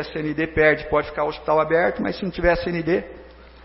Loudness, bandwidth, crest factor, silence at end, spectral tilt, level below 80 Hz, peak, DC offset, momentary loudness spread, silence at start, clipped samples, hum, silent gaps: -21 LUFS; 5.8 kHz; 18 dB; 0 s; -10 dB/octave; -40 dBFS; -4 dBFS; under 0.1%; 8 LU; 0 s; under 0.1%; none; none